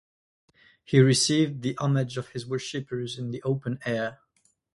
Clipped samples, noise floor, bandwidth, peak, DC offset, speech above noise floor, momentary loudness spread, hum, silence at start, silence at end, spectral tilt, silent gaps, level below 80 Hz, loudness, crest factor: under 0.1%; -69 dBFS; 11.5 kHz; -6 dBFS; under 0.1%; 44 dB; 13 LU; none; 0.9 s; 0.6 s; -5 dB/octave; none; -64 dBFS; -26 LUFS; 20 dB